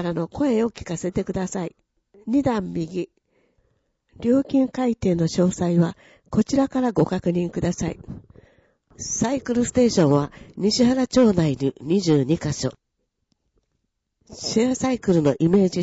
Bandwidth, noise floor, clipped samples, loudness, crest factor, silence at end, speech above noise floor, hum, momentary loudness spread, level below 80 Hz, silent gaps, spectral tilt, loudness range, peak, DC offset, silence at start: 8 kHz; -75 dBFS; under 0.1%; -22 LUFS; 14 dB; 0 s; 54 dB; none; 11 LU; -50 dBFS; none; -6 dB/octave; 5 LU; -8 dBFS; under 0.1%; 0 s